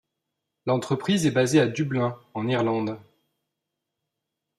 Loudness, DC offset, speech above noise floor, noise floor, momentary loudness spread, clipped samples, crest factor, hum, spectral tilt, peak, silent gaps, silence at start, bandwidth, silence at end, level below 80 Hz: -24 LUFS; under 0.1%; 60 dB; -83 dBFS; 11 LU; under 0.1%; 20 dB; none; -5.5 dB/octave; -8 dBFS; none; 0.65 s; 14 kHz; 1.6 s; -66 dBFS